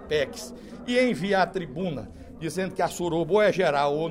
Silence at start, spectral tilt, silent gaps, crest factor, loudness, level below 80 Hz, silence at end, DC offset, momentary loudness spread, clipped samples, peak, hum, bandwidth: 0 s; -5 dB/octave; none; 16 dB; -25 LUFS; -52 dBFS; 0 s; under 0.1%; 16 LU; under 0.1%; -8 dBFS; none; 16 kHz